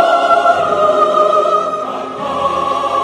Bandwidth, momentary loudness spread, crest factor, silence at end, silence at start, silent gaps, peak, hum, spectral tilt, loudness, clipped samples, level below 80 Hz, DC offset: 11.5 kHz; 10 LU; 14 dB; 0 s; 0 s; none; 0 dBFS; none; -4 dB/octave; -13 LUFS; under 0.1%; -54 dBFS; under 0.1%